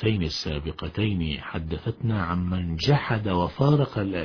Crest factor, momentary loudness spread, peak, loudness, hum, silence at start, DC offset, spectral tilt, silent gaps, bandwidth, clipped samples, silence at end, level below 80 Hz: 18 dB; 9 LU; -6 dBFS; -26 LUFS; none; 0 s; under 0.1%; -7 dB/octave; none; 5.4 kHz; under 0.1%; 0 s; -42 dBFS